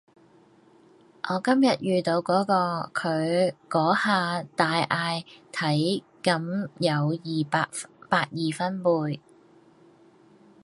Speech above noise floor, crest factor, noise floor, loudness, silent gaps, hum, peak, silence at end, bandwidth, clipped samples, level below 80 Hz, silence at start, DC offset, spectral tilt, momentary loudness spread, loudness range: 32 dB; 22 dB; -57 dBFS; -25 LUFS; none; none; -6 dBFS; 1.45 s; 11.5 kHz; under 0.1%; -72 dBFS; 1.25 s; under 0.1%; -5.5 dB/octave; 8 LU; 3 LU